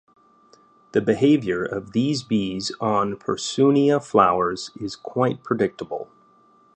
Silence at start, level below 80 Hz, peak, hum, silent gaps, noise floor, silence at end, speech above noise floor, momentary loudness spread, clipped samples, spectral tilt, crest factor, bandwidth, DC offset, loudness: 0.95 s; -58 dBFS; -2 dBFS; none; none; -56 dBFS; 0.7 s; 35 dB; 13 LU; under 0.1%; -6 dB/octave; 20 dB; 9.4 kHz; under 0.1%; -22 LUFS